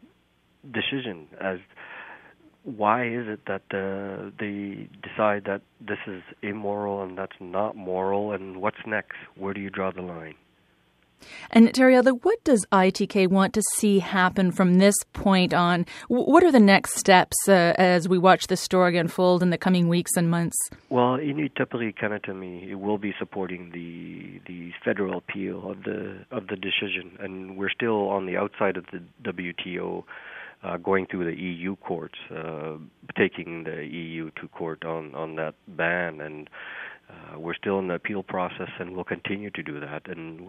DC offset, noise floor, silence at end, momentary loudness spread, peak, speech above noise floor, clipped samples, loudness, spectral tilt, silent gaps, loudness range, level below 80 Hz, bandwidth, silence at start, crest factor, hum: under 0.1%; -65 dBFS; 0 s; 19 LU; -2 dBFS; 40 dB; under 0.1%; -24 LUFS; -5 dB/octave; none; 12 LU; -60 dBFS; 14.5 kHz; 0.65 s; 24 dB; none